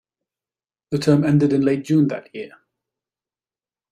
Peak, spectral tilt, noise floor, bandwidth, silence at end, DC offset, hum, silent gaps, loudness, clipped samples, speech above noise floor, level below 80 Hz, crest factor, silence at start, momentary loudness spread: -4 dBFS; -8 dB/octave; under -90 dBFS; 12.5 kHz; 1.45 s; under 0.1%; none; none; -19 LUFS; under 0.1%; over 72 dB; -60 dBFS; 18 dB; 0.9 s; 19 LU